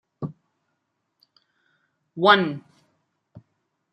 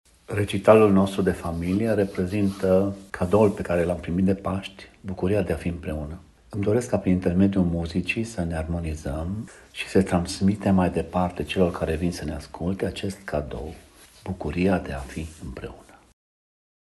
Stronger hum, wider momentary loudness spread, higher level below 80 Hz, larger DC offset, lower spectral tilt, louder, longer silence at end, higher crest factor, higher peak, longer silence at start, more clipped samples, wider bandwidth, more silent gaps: neither; first, 22 LU vs 15 LU; second, -74 dBFS vs -42 dBFS; neither; about the same, -6.5 dB/octave vs -7 dB/octave; first, -19 LUFS vs -24 LUFS; second, 0.55 s vs 1.05 s; about the same, 24 dB vs 24 dB; second, -4 dBFS vs 0 dBFS; about the same, 0.2 s vs 0.3 s; neither; second, 9.4 kHz vs 12.5 kHz; neither